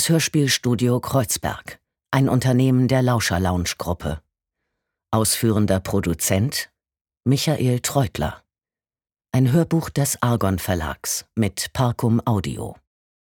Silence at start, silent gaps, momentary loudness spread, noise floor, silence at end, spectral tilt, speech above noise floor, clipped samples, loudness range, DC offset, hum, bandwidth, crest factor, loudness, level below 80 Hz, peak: 0 s; 7.01-7.05 s; 10 LU; under -90 dBFS; 0.55 s; -5 dB/octave; over 70 dB; under 0.1%; 3 LU; under 0.1%; none; 19 kHz; 20 dB; -21 LUFS; -44 dBFS; -2 dBFS